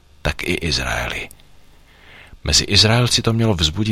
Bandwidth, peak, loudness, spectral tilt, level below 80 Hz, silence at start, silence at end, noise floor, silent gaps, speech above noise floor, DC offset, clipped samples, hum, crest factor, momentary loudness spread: 16 kHz; -2 dBFS; -17 LUFS; -3.5 dB/octave; -32 dBFS; 0.25 s; 0 s; -48 dBFS; none; 30 dB; under 0.1%; under 0.1%; none; 18 dB; 14 LU